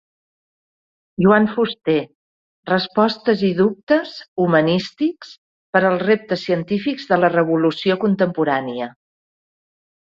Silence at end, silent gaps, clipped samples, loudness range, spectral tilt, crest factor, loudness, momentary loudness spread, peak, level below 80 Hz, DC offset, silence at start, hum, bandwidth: 1.3 s; 2.15-2.63 s, 3.83-3.87 s, 4.28-4.36 s, 5.38-5.73 s; under 0.1%; 2 LU; -7.5 dB/octave; 18 dB; -18 LUFS; 9 LU; -2 dBFS; -60 dBFS; under 0.1%; 1.2 s; none; 7.4 kHz